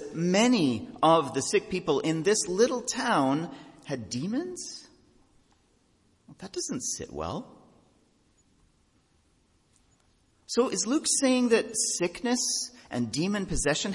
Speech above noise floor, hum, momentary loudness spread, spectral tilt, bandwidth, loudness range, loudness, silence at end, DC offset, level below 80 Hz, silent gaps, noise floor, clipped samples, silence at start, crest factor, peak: 40 dB; none; 14 LU; -3.5 dB/octave; 11.5 kHz; 12 LU; -27 LUFS; 0 s; under 0.1%; -54 dBFS; none; -67 dBFS; under 0.1%; 0 s; 20 dB; -8 dBFS